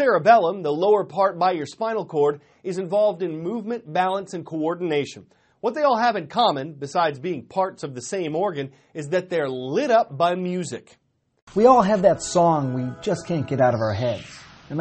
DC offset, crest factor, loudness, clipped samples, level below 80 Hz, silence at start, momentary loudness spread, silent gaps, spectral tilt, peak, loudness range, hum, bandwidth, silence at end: under 0.1%; 20 dB; -22 LUFS; under 0.1%; -60 dBFS; 0 s; 13 LU; 11.42-11.47 s; -5.5 dB/octave; -2 dBFS; 5 LU; none; 8.8 kHz; 0 s